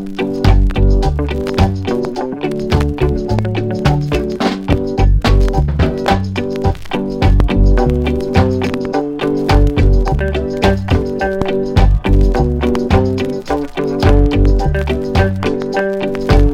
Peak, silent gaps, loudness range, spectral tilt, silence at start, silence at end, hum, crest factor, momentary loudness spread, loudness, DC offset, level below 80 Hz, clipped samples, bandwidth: 0 dBFS; none; 2 LU; -7.5 dB/octave; 0 s; 0 s; none; 12 dB; 6 LU; -15 LUFS; under 0.1%; -16 dBFS; under 0.1%; 9.2 kHz